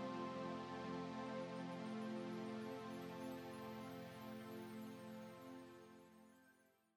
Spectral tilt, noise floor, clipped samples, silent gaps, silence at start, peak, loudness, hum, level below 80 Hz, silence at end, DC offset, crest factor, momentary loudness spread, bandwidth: -6 dB/octave; -75 dBFS; under 0.1%; none; 0 s; -36 dBFS; -50 LUFS; none; under -90 dBFS; 0.35 s; under 0.1%; 16 dB; 12 LU; 18 kHz